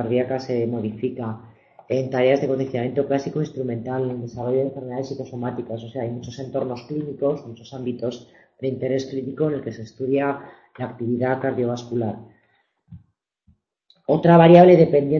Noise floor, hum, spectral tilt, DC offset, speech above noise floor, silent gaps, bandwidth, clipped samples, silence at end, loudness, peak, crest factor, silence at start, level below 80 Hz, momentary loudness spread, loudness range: -65 dBFS; none; -8.5 dB/octave; under 0.1%; 45 dB; none; 6.8 kHz; under 0.1%; 0 s; -21 LUFS; 0 dBFS; 22 dB; 0 s; -60 dBFS; 16 LU; 7 LU